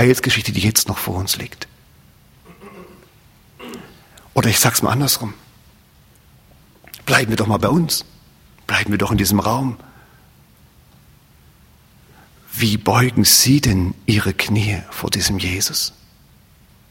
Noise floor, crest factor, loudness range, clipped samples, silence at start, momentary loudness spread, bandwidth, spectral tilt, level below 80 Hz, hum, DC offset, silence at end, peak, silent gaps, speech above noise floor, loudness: -50 dBFS; 20 dB; 11 LU; under 0.1%; 0 s; 18 LU; 16.5 kHz; -3.5 dB/octave; -42 dBFS; none; under 0.1%; 1 s; 0 dBFS; none; 33 dB; -17 LUFS